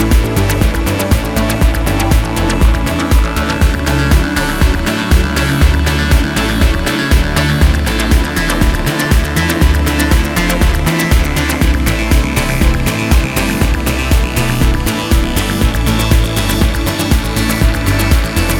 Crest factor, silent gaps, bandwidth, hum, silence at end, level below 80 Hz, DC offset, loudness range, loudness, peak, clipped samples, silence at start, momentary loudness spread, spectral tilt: 12 dB; none; 18 kHz; none; 0 s; -14 dBFS; under 0.1%; 1 LU; -13 LUFS; 0 dBFS; under 0.1%; 0 s; 2 LU; -5 dB/octave